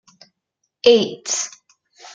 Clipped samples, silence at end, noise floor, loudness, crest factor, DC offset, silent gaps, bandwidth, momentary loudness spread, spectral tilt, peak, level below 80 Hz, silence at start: under 0.1%; 0.65 s; -76 dBFS; -18 LUFS; 20 dB; under 0.1%; none; 9.4 kHz; 9 LU; -2 dB/octave; -2 dBFS; -72 dBFS; 0.85 s